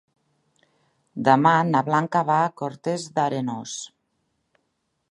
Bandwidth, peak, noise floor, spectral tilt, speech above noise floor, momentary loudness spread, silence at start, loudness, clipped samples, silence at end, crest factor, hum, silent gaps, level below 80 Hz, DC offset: 11.5 kHz; -2 dBFS; -75 dBFS; -5.5 dB/octave; 53 dB; 16 LU; 1.15 s; -22 LUFS; under 0.1%; 1.25 s; 22 dB; none; none; -72 dBFS; under 0.1%